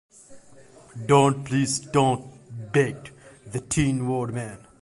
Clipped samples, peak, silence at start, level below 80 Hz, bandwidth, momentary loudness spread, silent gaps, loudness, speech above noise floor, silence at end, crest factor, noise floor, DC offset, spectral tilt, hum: under 0.1%; -4 dBFS; 0.3 s; -50 dBFS; 11.5 kHz; 21 LU; none; -24 LUFS; 28 dB; 0.25 s; 20 dB; -51 dBFS; under 0.1%; -5.5 dB/octave; none